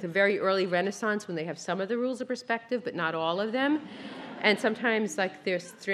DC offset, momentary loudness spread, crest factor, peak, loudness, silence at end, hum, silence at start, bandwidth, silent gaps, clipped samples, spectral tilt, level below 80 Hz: under 0.1%; 9 LU; 22 dB; -8 dBFS; -29 LUFS; 0 s; none; 0 s; 13.5 kHz; none; under 0.1%; -4.5 dB/octave; -80 dBFS